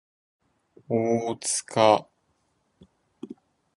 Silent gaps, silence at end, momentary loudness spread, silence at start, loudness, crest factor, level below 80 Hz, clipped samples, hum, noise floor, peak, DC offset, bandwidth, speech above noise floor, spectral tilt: none; 0.45 s; 23 LU; 0.9 s; -24 LUFS; 24 dB; -70 dBFS; under 0.1%; none; -71 dBFS; -4 dBFS; under 0.1%; 11.5 kHz; 48 dB; -4 dB/octave